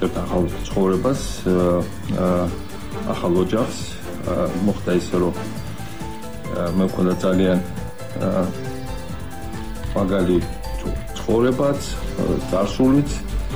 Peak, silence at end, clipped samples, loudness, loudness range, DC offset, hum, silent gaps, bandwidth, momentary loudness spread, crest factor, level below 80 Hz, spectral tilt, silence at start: -6 dBFS; 0 s; under 0.1%; -22 LUFS; 3 LU; 2%; none; none; over 20 kHz; 13 LU; 14 dB; -34 dBFS; -6.5 dB/octave; 0 s